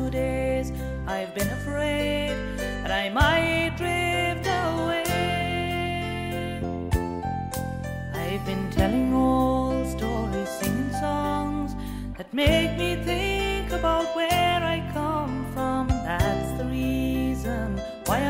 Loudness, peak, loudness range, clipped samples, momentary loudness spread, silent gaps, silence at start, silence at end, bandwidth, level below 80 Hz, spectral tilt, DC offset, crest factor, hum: -26 LUFS; -6 dBFS; 3 LU; under 0.1%; 9 LU; none; 0 s; 0 s; 16 kHz; -36 dBFS; -5.5 dB/octave; under 0.1%; 20 dB; none